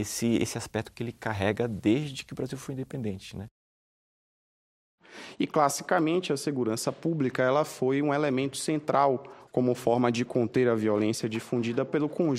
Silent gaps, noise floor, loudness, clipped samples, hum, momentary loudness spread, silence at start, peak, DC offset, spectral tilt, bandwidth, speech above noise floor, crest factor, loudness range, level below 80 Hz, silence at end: 3.51-4.98 s; under -90 dBFS; -28 LUFS; under 0.1%; none; 11 LU; 0 s; -8 dBFS; under 0.1%; -5.5 dB/octave; 16 kHz; over 62 dB; 20 dB; 7 LU; -64 dBFS; 0 s